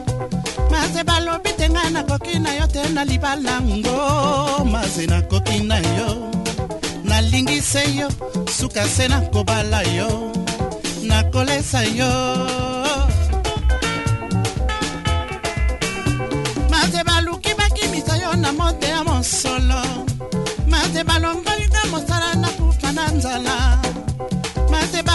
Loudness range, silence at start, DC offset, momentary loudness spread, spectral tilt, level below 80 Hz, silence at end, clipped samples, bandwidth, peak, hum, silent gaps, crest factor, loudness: 2 LU; 0 s; under 0.1%; 6 LU; -4.5 dB/octave; -24 dBFS; 0 s; under 0.1%; 12 kHz; -2 dBFS; none; none; 16 dB; -19 LUFS